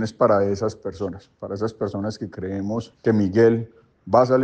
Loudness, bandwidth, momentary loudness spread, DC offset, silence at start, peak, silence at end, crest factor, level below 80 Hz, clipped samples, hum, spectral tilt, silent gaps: -22 LUFS; 8.8 kHz; 14 LU; under 0.1%; 0 s; -4 dBFS; 0 s; 18 dB; -58 dBFS; under 0.1%; none; -7.5 dB/octave; none